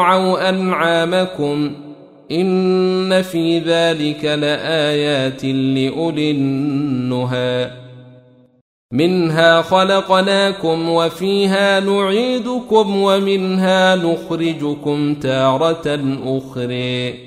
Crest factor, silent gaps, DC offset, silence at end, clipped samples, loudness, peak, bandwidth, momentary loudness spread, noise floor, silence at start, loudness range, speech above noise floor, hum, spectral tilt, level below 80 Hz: 16 dB; 8.61-8.89 s; under 0.1%; 0 s; under 0.1%; -16 LUFS; 0 dBFS; 14.5 kHz; 7 LU; -47 dBFS; 0 s; 4 LU; 31 dB; none; -6 dB/octave; -56 dBFS